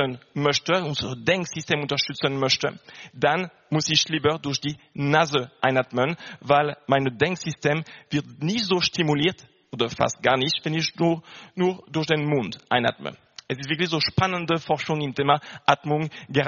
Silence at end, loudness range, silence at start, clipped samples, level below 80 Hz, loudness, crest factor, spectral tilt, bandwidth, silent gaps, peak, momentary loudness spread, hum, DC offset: 0 s; 2 LU; 0 s; under 0.1%; -58 dBFS; -24 LUFS; 24 dB; -3.5 dB/octave; 7.2 kHz; none; 0 dBFS; 8 LU; none; under 0.1%